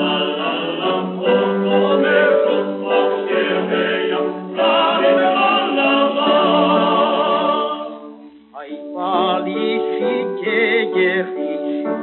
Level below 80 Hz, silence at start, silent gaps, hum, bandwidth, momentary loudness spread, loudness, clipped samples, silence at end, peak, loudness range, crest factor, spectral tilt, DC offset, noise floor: -70 dBFS; 0 s; none; none; 4.3 kHz; 9 LU; -17 LUFS; under 0.1%; 0 s; -4 dBFS; 5 LU; 14 dB; -2.5 dB/octave; under 0.1%; -39 dBFS